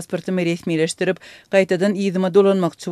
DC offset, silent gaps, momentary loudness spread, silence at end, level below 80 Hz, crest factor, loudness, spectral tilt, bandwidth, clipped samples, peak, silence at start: under 0.1%; none; 8 LU; 0 s; -66 dBFS; 18 dB; -19 LUFS; -6 dB/octave; 13 kHz; under 0.1%; -2 dBFS; 0 s